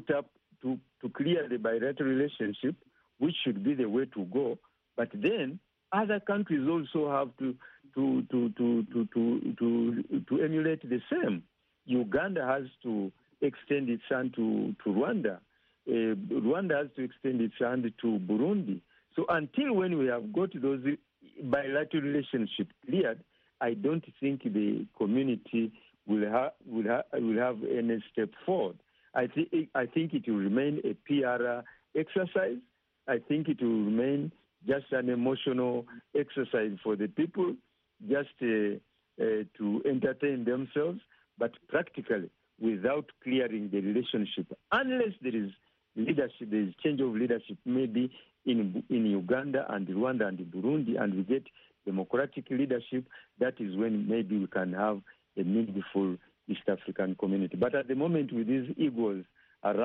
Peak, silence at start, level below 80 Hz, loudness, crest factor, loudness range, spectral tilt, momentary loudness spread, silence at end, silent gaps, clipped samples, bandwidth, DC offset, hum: -14 dBFS; 0 s; -74 dBFS; -32 LUFS; 18 dB; 2 LU; -5.5 dB/octave; 7 LU; 0 s; none; under 0.1%; 4.1 kHz; under 0.1%; none